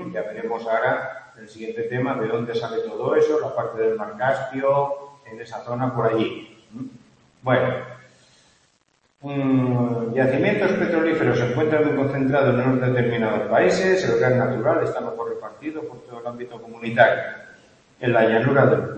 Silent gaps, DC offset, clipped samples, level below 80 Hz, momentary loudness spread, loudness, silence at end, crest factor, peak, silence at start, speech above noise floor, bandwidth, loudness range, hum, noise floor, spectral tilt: none; under 0.1%; under 0.1%; -60 dBFS; 17 LU; -21 LUFS; 0 s; 20 dB; -2 dBFS; 0 s; 44 dB; 8.6 kHz; 6 LU; none; -65 dBFS; -7 dB/octave